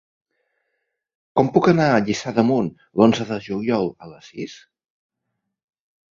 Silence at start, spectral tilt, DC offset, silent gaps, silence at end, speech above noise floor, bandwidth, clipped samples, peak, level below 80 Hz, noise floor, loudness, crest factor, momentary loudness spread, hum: 1.35 s; -6.5 dB/octave; under 0.1%; none; 1.6 s; 59 dB; 7.6 kHz; under 0.1%; -2 dBFS; -58 dBFS; -78 dBFS; -19 LUFS; 20 dB; 17 LU; none